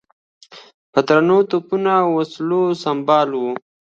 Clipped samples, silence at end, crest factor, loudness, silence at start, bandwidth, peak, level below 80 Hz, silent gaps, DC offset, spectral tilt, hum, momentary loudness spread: under 0.1%; 0.4 s; 18 dB; -17 LUFS; 0.5 s; 7.6 kHz; 0 dBFS; -68 dBFS; 0.74-0.93 s; under 0.1%; -7 dB/octave; none; 7 LU